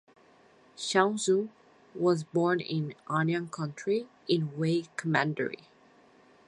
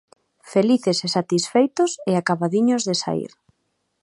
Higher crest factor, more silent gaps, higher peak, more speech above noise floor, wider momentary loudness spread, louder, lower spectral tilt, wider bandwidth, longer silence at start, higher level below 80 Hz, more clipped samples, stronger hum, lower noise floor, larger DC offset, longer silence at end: about the same, 22 dB vs 18 dB; neither; second, -8 dBFS vs -4 dBFS; second, 31 dB vs 52 dB; first, 10 LU vs 5 LU; second, -30 LUFS vs -21 LUFS; about the same, -5.5 dB/octave vs -5 dB/octave; about the same, 11.5 kHz vs 11.5 kHz; first, 0.8 s vs 0.45 s; second, -76 dBFS vs -68 dBFS; neither; neither; second, -60 dBFS vs -72 dBFS; neither; first, 0.9 s vs 0.75 s